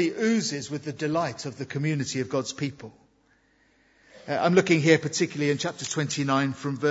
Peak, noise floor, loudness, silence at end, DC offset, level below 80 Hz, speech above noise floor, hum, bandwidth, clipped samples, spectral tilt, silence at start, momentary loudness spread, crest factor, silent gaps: -4 dBFS; -64 dBFS; -26 LUFS; 0 s; under 0.1%; -68 dBFS; 39 dB; none; 8 kHz; under 0.1%; -5 dB/octave; 0 s; 13 LU; 22 dB; none